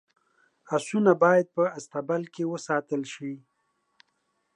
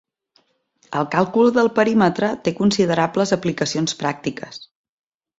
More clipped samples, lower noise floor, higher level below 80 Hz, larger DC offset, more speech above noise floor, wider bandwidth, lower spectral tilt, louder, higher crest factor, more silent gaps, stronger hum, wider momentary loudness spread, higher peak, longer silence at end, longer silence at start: neither; first, -75 dBFS vs -63 dBFS; second, -82 dBFS vs -58 dBFS; neither; first, 49 dB vs 44 dB; first, 11 kHz vs 8 kHz; about the same, -6 dB/octave vs -5 dB/octave; second, -26 LUFS vs -19 LUFS; about the same, 22 dB vs 18 dB; neither; neither; first, 15 LU vs 12 LU; second, -6 dBFS vs -2 dBFS; first, 1.2 s vs 0.75 s; second, 0.7 s vs 0.9 s